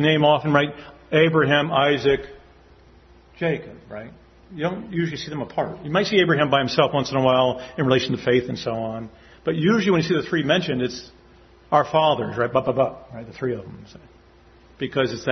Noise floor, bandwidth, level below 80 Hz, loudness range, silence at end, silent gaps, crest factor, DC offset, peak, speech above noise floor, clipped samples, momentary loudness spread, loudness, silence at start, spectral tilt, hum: -51 dBFS; 6.4 kHz; -54 dBFS; 7 LU; 0 s; none; 20 dB; under 0.1%; -2 dBFS; 30 dB; under 0.1%; 15 LU; -21 LUFS; 0 s; -6 dB/octave; none